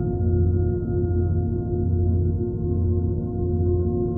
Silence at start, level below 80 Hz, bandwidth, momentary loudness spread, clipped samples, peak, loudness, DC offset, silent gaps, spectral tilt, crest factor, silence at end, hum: 0 s; -34 dBFS; 1.5 kHz; 3 LU; under 0.1%; -10 dBFS; -23 LUFS; under 0.1%; none; -15 dB/octave; 12 dB; 0 s; none